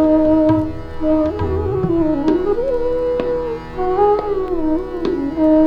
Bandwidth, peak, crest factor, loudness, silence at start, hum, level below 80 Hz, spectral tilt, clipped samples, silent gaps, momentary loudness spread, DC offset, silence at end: 5.6 kHz; -4 dBFS; 12 dB; -18 LUFS; 0 s; none; -32 dBFS; -9.5 dB/octave; under 0.1%; none; 7 LU; under 0.1%; 0 s